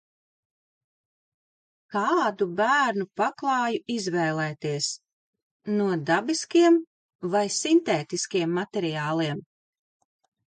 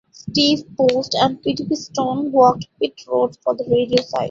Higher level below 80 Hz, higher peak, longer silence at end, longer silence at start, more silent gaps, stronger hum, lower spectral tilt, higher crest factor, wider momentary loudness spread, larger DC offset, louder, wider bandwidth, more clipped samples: second, -76 dBFS vs -56 dBFS; second, -10 dBFS vs -2 dBFS; first, 1.05 s vs 0 s; first, 1.9 s vs 0.25 s; first, 5.13-5.33 s, 5.43-5.60 s, 6.87-7.09 s, 7.15-7.19 s vs none; neither; about the same, -4.5 dB/octave vs -5 dB/octave; about the same, 16 dB vs 18 dB; about the same, 8 LU vs 9 LU; neither; second, -25 LUFS vs -19 LUFS; first, 9.4 kHz vs 7.6 kHz; neither